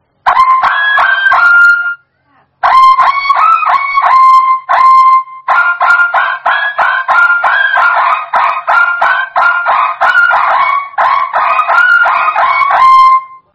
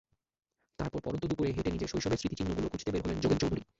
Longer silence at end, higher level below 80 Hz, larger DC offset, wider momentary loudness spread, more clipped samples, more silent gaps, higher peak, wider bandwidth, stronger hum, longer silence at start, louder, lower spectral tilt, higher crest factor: about the same, 0.2 s vs 0.15 s; about the same, -52 dBFS vs -48 dBFS; neither; about the same, 6 LU vs 6 LU; first, 1% vs under 0.1%; neither; first, 0 dBFS vs -16 dBFS; about the same, 8.8 kHz vs 8 kHz; neither; second, 0.25 s vs 0.8 s; first, -8 LUFS vs -34 LUFS; second, -1 dB/octave vs -6 dB/octave; second, 8 dB vs 18 dB